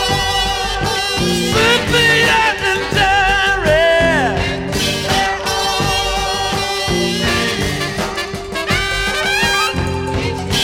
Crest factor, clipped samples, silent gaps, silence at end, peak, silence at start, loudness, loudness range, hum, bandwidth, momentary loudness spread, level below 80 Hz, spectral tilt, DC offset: 14 dB; under 0.1%; none; 0 s; 0 dBFS; 0 s; -15 LUFS; 4 LU; none; 17 kHz; 8 LU; -30 dBFS; -3.5 dB/octave; under 0.1%